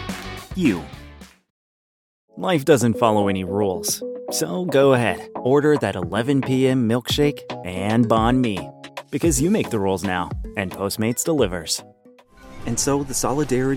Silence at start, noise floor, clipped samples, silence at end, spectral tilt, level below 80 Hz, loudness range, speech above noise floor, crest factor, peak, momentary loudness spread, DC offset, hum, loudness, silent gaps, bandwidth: 0 s; -51 dBFS; under 0.1%; 0 s; -5 dB/octave; -42 dBFS; 4 LU; 31 dB; 20 dB; -2 dBFS; 12 LU; under 0.1%; none; -21 LUFS; 1.50-2.28 s; 19 kHz